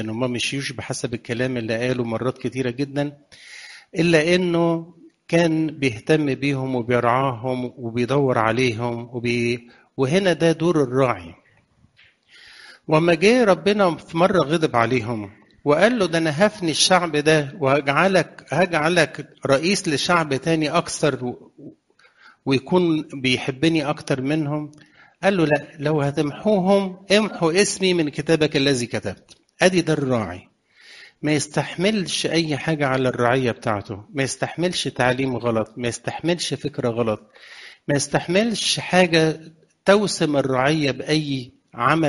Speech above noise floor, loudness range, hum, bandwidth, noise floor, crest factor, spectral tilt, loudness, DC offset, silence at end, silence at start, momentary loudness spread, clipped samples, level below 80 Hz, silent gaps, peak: 38 dB; 4 LU; none; 11.5 kHz; -58 dBFS; 20 dB; -5 dB/octave; -21 LUFS; under 0.1%; 0 s; 0 s; 10 LU; under 0.1%; -56 dBFS; none; 0 dBFS